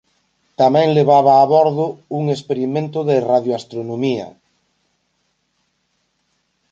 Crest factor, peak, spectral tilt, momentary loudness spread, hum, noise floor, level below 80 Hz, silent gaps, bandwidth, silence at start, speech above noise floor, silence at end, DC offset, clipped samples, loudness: 16 dB; -2 dBFS; -7.5 dB/octave; 13 LU; none; -68 dBFS; -66 dBFS; none; 7.8 kHz; 0.6 s; 52 dB; 2.45 s; under 0.1%; under 0.1%; -16 LUFS